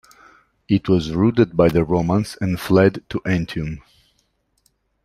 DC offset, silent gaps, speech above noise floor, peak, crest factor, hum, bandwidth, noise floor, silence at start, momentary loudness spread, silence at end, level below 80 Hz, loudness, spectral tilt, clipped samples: under 0.1%; none; 48 dB; -2 dBFS; 18 dB; none; 15 kHz; -66 dBFS; 0.7 s; 11 LU; 1.25 s; -44 dBFS; -19 LUFS; -7.5 dB/octave; under 0.1%